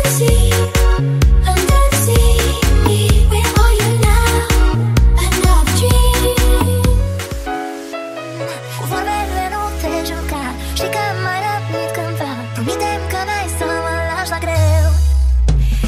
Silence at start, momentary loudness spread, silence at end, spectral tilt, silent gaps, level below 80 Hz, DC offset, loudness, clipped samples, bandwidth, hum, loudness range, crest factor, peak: 0 s; 10 LU; 0 s; -5 dB/octave; none; -16 dBFS; under 0.1%; -15 LUFS; under 0.1%; 16 kHz; none; 7 LU; 12 dB; 0 dBFS